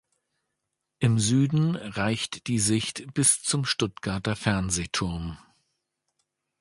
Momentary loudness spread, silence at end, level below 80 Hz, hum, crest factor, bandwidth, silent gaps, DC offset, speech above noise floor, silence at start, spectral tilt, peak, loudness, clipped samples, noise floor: 8 LU; 1.25 s; -50 dBFS; none; 20 dB; 11.5 kHz; none; under 0.1%; 56 dB; 1 s; -4 dB/octave; -6 dBFS; -25 LUFS; under 0.1%; -82 dBFS